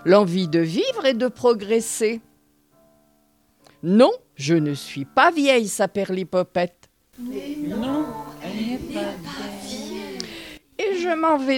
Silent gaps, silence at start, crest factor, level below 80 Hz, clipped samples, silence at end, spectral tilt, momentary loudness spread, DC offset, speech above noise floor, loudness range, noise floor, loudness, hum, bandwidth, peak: none; 0 s; 22 dB; -58 dBFS; under 0.1%; 0 s; -5 dB/octave; 16 LU; under 0.1%; 41 dB; 9 LU; -62 dBFS; -22 LUFS; none; 18 kHz; -2 dBFS